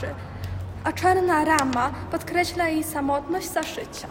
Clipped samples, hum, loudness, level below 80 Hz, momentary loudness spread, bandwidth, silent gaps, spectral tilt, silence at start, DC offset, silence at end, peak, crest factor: under 0.1%; none; -24 LUFS; -46 dBFS; 13 LU; 16.5 kHz; none; -4.5 dB/octave; 0 s; under 0.1%; 0 s; -2 dBFS; 22 dB